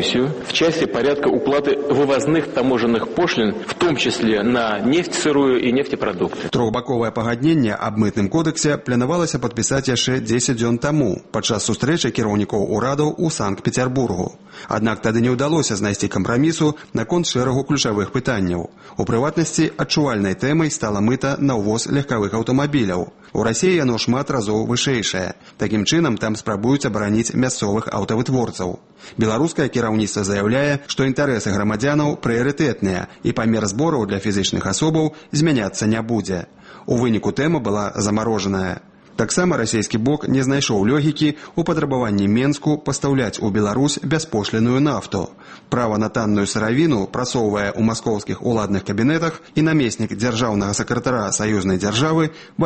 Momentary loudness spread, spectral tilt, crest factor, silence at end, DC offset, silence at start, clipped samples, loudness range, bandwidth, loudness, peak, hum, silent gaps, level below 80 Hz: 5 LU; -5 dB/octave; 16 dB; 0 s; under 0.1%; 0 s; under 0.1%; 2 LU; 8.8 kHz; -19 LUFS; -4 dBFS; none; none; -48 dBFS